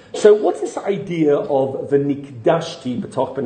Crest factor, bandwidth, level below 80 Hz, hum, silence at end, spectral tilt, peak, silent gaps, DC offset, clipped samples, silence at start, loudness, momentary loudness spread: 18 dB; 9.4 kHz; -62 dBFS; none; 0 s; -6.5 dB/octave; 0 dBFS; none; under 0.1%; under 0.1%; 0.15 s; -19 LUFS; 11 LU